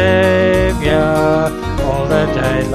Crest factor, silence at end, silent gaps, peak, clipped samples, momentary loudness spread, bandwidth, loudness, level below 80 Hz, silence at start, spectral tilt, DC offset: 12 dB; 0 s; none; -2 dBFS; under 0.1%; 6 LU; 14 kHz; -14 LUFS; -26 dBFS; 0 s; -6.5 dB/octave; under 0.1%